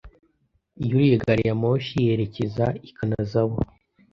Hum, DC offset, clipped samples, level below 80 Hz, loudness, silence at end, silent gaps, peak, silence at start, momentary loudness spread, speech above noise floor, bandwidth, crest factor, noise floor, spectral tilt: none; under 0.1%; under 0.1%; -46 dBFS; -23 LUFS; 0.5 s; none; -6 dBFS; 0.05 s; 10 LU; 46 dB; 7 kHz; 18 dB; -68 dBFS; -9 dB/octave